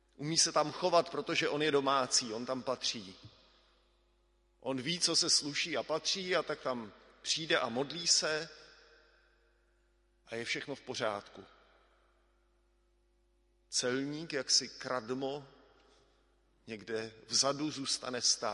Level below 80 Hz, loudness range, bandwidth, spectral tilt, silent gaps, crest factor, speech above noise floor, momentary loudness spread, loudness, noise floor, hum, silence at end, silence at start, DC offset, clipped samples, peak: -72 dBFS; 10 LU; 11.5 kHz; -2 dB/octave; none; 22 dB; 38 dB; 13 LU; -33 LUFS; -72 dBFS; none; 0 s; 0.2 s; under 0.1%; under 0.1%; -14 dBFS